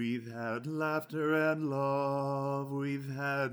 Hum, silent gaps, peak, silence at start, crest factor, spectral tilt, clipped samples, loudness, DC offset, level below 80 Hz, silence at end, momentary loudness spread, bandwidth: none; none; -18 dBFS; 0 s; 14 dB; -7.5 dB/octave; under 0.1%; -33 LUFS; under 0.1%; -78 dBFS; 0 s; 7 LU; over 20 kHz